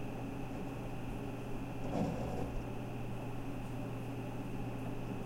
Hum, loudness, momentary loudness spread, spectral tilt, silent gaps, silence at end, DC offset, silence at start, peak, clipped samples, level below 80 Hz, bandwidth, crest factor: none; -42 LUFS; 5 LU; -7.5 dB/octave; none; 0 s; under 0.1%; 0 s; -24 dBFS; under 0.1%; -48 dBFS; 16.5 kHz; 16 dB